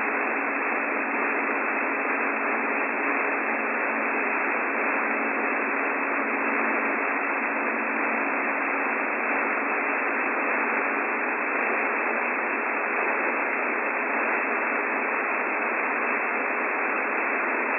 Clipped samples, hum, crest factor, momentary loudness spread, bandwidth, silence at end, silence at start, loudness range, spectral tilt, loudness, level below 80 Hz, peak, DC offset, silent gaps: under 0.1%; none; 14 dB; 1 LU; 6 kHz; 0 s; 0 s; 0 LU; -8.5 dB/octave; -25 LUFS; under -90 dBFS; -12 dBFS; under 0.1%; none